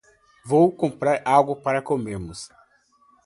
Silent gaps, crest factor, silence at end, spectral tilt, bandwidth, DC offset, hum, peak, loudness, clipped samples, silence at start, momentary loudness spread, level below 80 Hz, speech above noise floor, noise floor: none; 20 dB; 0.8 s; -6.5 dB/octave; 11.5 kHz; under 0.1%; none; -2 dBFS; -21 LUFS; under 0.1%; 0.45 s; 17 LU; -54 dBFS; 39 dB; -60 dBFS